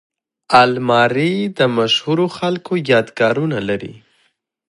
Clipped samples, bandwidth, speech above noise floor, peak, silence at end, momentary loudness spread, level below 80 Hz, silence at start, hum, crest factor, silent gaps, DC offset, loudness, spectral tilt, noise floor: under 0.1%; 11.5 kHz; 48 dB; 0 dBFS; 0.75 s; 9 LU; -58 dBFS; 0.5 s; none; 16 dB; none; under 0.1%; -16 LUFS; -5.5 dB/octave; -63 dBFS